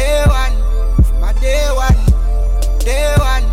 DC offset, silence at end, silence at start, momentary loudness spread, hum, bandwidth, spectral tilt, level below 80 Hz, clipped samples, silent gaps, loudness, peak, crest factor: under 0.1%; 0 s; 0 s; 4 LU; none; 14.5 kHz; -5.5 dB/octave; -12 dBFS; under 0.1%; none; -15 LUFS; -2 dBFS; 8 dB